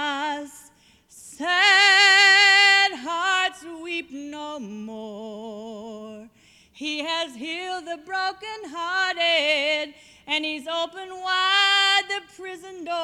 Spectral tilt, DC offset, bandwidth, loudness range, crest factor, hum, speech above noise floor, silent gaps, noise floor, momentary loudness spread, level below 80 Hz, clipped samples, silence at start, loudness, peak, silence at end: 0 dB/octave; under 0.1%; 15.5 kHz; 16 LU; 18 dB; none; 31 dB; none; -55 dBFS; 23 LU; -70 dBFS; under 0.1%; 0 s; -19 LUFS; -6 dBFS; 0 s